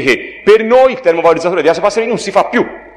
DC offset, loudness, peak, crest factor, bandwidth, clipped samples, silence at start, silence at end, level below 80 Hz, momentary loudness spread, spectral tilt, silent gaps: under 0.1%; -11 LUFS; 0 dBFS; 12 dB; 10.5 kHz; under 0.1%; 0 s; 0.15 s; -48 dBFS; 6 LU; -4.5 dB/octave; none